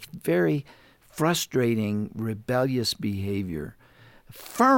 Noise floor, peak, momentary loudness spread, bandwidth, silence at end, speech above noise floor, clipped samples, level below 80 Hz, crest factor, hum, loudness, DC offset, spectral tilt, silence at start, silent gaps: -53 dBFS; -8 dBFS; 13 LU; 17 kHz; 0 s; 29 dB; under 0.1%; -58 dBFS; 18 dB; none; -26 LUFS; under 0.1%; -5.5 dB/octave; 0 s; none